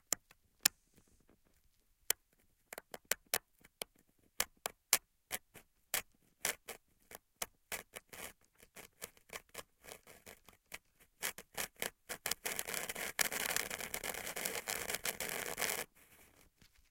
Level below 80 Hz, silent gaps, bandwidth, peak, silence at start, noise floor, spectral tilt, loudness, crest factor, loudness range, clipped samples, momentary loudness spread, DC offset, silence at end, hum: -70 dBFS; none; 17 kHz; -6 dBFS; 0.1 s; -74 dBFS; 0 dB/octave; -39 LUFS; 38 dB; 11 LU; under 0.1%; 20 LU; under 0.1%; 0.25 s; none